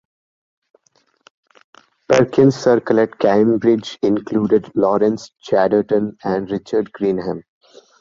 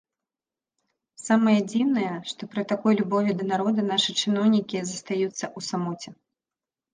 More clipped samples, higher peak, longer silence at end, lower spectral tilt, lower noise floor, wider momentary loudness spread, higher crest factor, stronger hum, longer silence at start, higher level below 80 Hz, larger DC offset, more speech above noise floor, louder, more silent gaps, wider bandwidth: neither; first, -2 dBFS vs -6 dBFS; second, 0.6 s vs 0.8 s; first, -7 dB/octave vs -5 dB/octave; second, -62 dBFS vs under -90 dBFS; second, 8 LU vs 11 LU; about the same, 16 dB vs 18 dB; neither; first, 2.1 s vs 1.2 s; first, -56 dBFS vs -74 dBFS; neither; second, 45 dB vs over 66 dB; first, -17 LUFS vs -25 LUFS; neither; second, 7.6 kHz vs 9.8 kHz